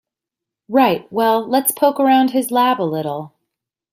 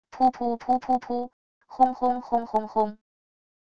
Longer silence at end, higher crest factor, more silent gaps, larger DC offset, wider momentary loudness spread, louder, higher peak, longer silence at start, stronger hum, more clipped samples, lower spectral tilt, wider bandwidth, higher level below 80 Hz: about the same, 0.65 s vs 0.75 s; about the same, 16 dB vs 20 dB; second, none vs 1.33-1.61 s; second, under 0.1% vs 0.4%; about the same, 8 LU vs 9 LU; first, -16 LUFS vs -26 LUFS; first, 0 dBFS vs -8 dBFS; first, 0.7 s vs 0.1 s; neither; neither; second, -4 dB/octave vs -7 dB/octave; first, 16 kHz vs 7 kHz; about the same, -66 dBFS vs -62 dBFS